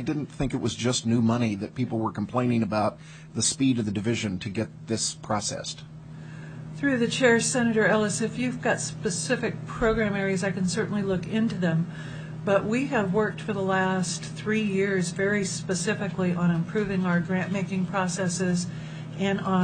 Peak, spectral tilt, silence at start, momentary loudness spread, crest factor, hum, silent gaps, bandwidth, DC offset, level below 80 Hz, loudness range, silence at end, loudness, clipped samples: -8 dBFS; -5 dB/octave; 0 s; 9 LU; 18 dB; none; none; 9.4 kHz; under 0.1%; -52 dBFS; 3 LU; 0 s; -26 LUFS; under 0.1%